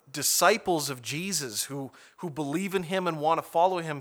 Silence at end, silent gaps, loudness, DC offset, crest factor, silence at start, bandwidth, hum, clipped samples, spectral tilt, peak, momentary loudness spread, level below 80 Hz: 0 s; none; -27 LUFS; under 0.1%; 22 dB; 0.1 s; over 20 kHz; none; under 0.1%; -3 dB/octave; -6 dBFS; 14 LU; -70 dBFS